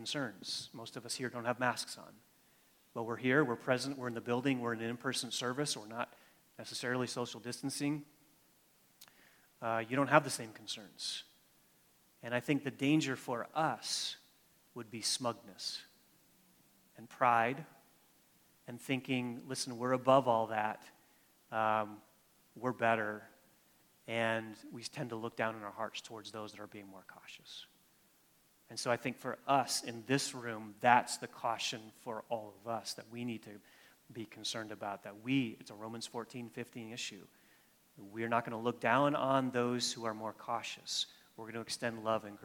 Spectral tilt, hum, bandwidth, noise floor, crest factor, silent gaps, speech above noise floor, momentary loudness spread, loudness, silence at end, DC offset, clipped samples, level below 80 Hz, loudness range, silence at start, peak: -4 dB/octave; none; 19 kHz; -70 dBFS; 28 dB; none; 33 dB; 18 LU; -37 LUFS; 0 s; under 0.1%; under 0.1%; -82 dBFS; 7 LU; 0 s; -10 dBFS